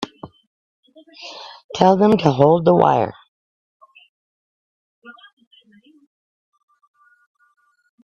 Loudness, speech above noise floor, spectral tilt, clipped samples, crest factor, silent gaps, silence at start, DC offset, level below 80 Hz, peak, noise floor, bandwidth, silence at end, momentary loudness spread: -15 LUFS; 36 dB; -7.5 dB/octave; under 0.1%; 22 dB; 0.47-0.83 s, 1.64-1.69 s, 3.28-3.80 s, 4.09-5.02 s; 0 s; under 0.1%; -60 dBFS; 0 dBFS; -52 dBFS; 8.2 kHz; 2.9 s; 22 LU